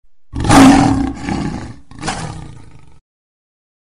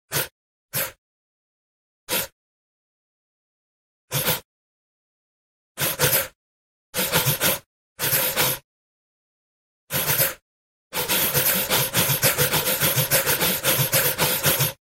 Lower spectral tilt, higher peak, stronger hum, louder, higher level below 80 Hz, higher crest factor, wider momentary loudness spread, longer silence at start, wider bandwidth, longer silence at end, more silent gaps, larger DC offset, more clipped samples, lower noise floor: first, -5 dB/octave vs -2 dB/octave; first, 0 dBFS vs -4 dBFS; neither; first, -12 LUFS vs -21 LUFS; first, -30 dBFS vs -52 dBFS; about the same, 16 dB vs 20 dB; first, 23 LU vs 10 LU; first, 0.35 s vs 0.1 s; second, 14.5 kHz vs 16 kHz; first, 1.45 s vs 0.2 s; second, none vs 0.32-0.69 s, 0.98-2.07 s, 2.32-4.08 s, 4.45-5.75 s, 6.35-6.93 s, 7.66-7.96 s, 8.64-9.87 s, 10.42-10.90 s; first, 1% vs under 0.1%; neither; second, -40 dBFS vs under -90 dBFS